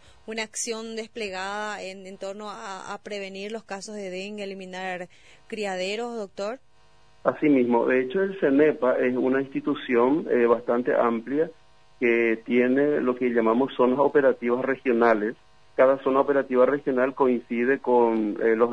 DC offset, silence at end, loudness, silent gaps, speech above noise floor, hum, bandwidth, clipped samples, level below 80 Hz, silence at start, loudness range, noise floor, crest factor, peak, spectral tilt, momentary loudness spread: 0.2%; 0 s; -24 LUFS; none; 36 dB; none; 10.5 kHz; under 0.1%; -66 dBFS; 0.3 s; 11 LU; -60 dBFS; 18 dB; -6 dBFS; -5 dB/octave; 14 LU